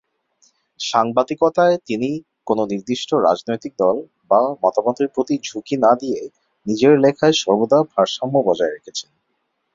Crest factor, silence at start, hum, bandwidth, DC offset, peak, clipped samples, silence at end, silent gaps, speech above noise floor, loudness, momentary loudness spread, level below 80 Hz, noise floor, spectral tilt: 18 dB; 0.8 s; none; 7.8 kHz; under 0.1%; -2 dBFS; under 0.1%; 0.75 s; none; 53 dB; -18 LUFS; 11 LU; -62 dBFS; -71 dBFS; -5 dB/octave